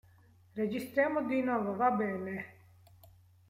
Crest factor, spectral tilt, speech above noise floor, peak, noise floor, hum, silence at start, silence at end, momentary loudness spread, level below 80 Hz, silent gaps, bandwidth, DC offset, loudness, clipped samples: 18 dB; -7 dB/octave; 30 dB; -16 dBFS; -62 dBFS; none; 0.55 s; 0.95 s; 12 LU; -74 dBFS; none; 16 kHz; under 0.1%; -33 LUFS; under 0.1%